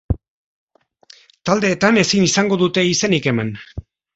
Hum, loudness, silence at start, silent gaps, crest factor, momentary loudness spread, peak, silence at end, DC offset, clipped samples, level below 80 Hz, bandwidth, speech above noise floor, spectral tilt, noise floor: none; -17 LUFS; 0.1 s; 0.28-0.67 s; 18 dB; 15 LU; 0 dBFS; 0.35 s; under 0.1%; under 0.1%; -40 dBFS; 8.2 kHz; 33 dB; -4 dB/octave; -50 dBFS